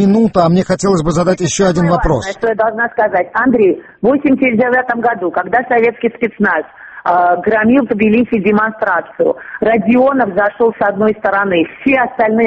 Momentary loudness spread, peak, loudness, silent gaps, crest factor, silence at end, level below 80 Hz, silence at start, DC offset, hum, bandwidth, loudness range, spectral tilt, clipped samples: 5 LU; 0 dBFS; -13 LUFS; none; 12 dB; 0 s; -36 dBFS; 0 s; under 0.1%; none; 8.6 kHz; 1 LU; -6 dB/octave; under 0.1%